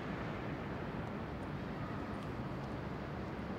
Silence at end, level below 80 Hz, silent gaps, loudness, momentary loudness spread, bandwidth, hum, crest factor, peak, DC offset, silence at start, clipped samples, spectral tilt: 0 s; -54 dBFS; none; -43 LUFS; 1 LU; 16 kHz; none; 14 dB; -28 dBFS; under 0.1%; 0 s; under 0.1%; -7.5 dB/octave